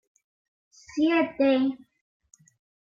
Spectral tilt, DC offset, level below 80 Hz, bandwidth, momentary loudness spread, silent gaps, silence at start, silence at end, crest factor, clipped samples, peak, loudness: -4.5 dB/octave; under 0.1%; -70 dBFS; 7.4 kHz; 13 LU; none; 0.95 s; 1.1 s; 16 dB; under 0.1%; -12 dBFS; -25 LUFS